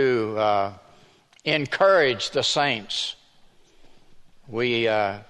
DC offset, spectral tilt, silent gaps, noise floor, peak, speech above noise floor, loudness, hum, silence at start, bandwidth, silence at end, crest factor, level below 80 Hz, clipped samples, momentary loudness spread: under 0.1%; -4 dB/octave; none; -55 dBFS; -6 dBFS; 33 dB; -22 LUFS; none; 0 s; 11 kHz; 0.05 s; 18 dB; -60 dBFS; under 0.1%; 12 LU